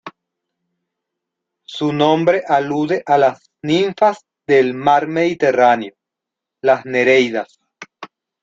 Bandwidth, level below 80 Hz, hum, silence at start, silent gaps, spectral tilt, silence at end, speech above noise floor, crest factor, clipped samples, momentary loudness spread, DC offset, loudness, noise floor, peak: 7.6 kHz; -62 dBFS; none; 0.05 s; none; -6 dB/octave; 0.35 s; 68 dB; 16 dB; under 0.1%; 16 LU; under 0.1%; -16 LUFS; -83 dBFS; -2 dBFS